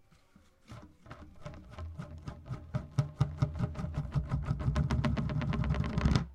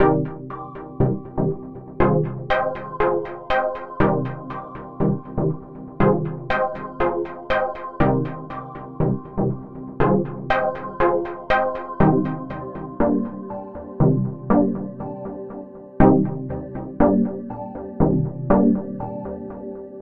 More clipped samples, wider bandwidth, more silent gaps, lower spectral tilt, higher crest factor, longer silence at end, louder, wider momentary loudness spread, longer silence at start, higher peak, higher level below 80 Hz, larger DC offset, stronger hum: neither; first, 10 kHz vs 5.6 kHz; neither; second, -7.5 dB/octave vs -10 dB/octave; about the same, 22 dB vs 22 dB; about the same, 0 s vs 0 s; second, -34 LUFS vs -22 LUFS; first, 21 LU vs 15 LU; first, 0.7 s vs 0 s; second, -12 dBFS vs 0 dBFS; about the same, -42 dBFS vs -38 dBFS; neither; neither